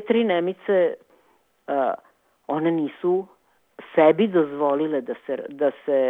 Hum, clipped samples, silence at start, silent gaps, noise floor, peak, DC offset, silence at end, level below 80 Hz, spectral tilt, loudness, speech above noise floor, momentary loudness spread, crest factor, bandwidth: none; under 0.1%; 0 s; none; -63 dBFS; -4 dBFS; under 0.1%; 0 s; -74 dBFS; -8.5 dB/octave; -23 LUFS; 41 dB; 12 LU; 18 dB; 4 kHz